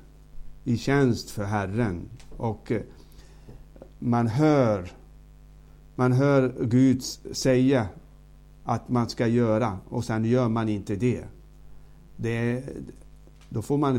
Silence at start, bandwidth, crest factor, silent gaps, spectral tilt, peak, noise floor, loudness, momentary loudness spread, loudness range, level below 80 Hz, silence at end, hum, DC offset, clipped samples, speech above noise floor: 0.35 s; 16 kHz; 18 dB; none; -7 dB/octave; -8 dBFS; -50 dBFS; -25 LUFS; 15 LU; 5 LU; -48 dBFS; 0 s; 50 Hz at -50 dBFS; under 0.1%; under 0.1%; 25 dB